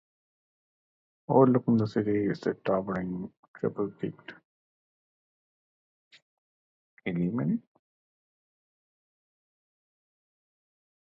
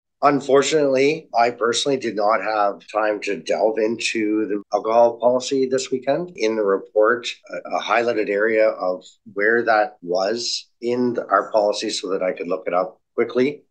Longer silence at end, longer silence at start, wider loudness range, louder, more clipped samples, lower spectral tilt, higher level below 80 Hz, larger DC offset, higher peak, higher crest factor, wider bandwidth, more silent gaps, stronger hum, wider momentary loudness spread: first, 3.55 s vs 0.15 s; first, 1.3 s vs 0.2 s; first, 12 LU vs 2 LU; second, -29 LUFS vs -20 LUFS; neither; first, -9.5 dB/octave vs -3.5 dB/octave; first, -66 dBFS vs -74 dBFS; neither; second, -8 dBFS vs -2 dBFS; first, 24 dB vs 18 dB; second, 7.4 kHz vs 10 kHz; first, 3.37-3.54 s, 4.45-6.11 s, 6.22-6.97 s vs none; neither; first, 16 LU vs 8 LU